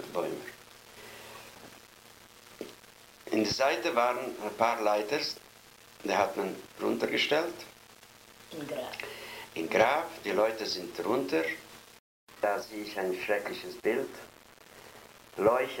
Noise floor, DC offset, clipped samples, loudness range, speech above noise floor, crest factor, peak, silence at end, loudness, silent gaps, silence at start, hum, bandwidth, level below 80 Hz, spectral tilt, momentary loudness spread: -55 dBFS; under 0.1%; under 0.1%; 4 LU; 25 dB; 24 dB; -10 dBFS; 0 s; -31 LUFS; 11.99-12.27 s; 0 s; none; 16.5 kHz; -68 dBFS; -3.5 dB/octave; 23 LU